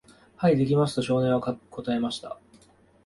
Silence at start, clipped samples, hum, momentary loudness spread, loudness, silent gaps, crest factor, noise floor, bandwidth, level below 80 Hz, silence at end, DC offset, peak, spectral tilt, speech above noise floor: 0.4 s; under 0.1%; none; 13 LU; -26 LUFS; none; 18 dB; -57 dBFS; 11.5 kHz; -58 dBFS; 0.7 s; under 0.1%; -10 dBFS; -7 dB/octave; 33 dB